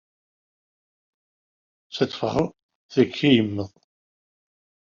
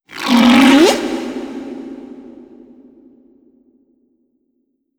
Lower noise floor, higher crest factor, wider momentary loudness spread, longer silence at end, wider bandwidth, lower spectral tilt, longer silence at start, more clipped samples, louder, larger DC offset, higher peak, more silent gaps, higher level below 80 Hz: first, under -90 dBFS vs -66 dBFS; first, 22 dB vs 16 dB; second, 14 LU vs 24 LU; second, 1.25 s vs 2.65 s; second, 7.4 kHz vs 19.5 kHz; first, -5 dB/octave vs -3.5 dB/octave; first, 1.9 s vs 0.15 s; neither; second, -23 LUFS vs -12 LUFS; neither; second, -4 dBFS vs 0 dBFS; first, 2.63-2.69 s, 2.75-2.89 s vs none; second, -58 dBFS vs -52 dBFS